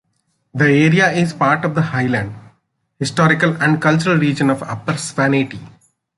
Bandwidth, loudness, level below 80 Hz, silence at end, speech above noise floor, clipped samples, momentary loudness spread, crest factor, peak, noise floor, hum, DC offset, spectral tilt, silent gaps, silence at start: 11.5 kHz; -16 LUFS; -54 dBFS; 0.5 s; 51 dB; under 0.1%; 10 LU; 16 dB; -2 dBFS; -67 dBFS; none; under 0.1%; -6 dB/octave; none; 0.55 s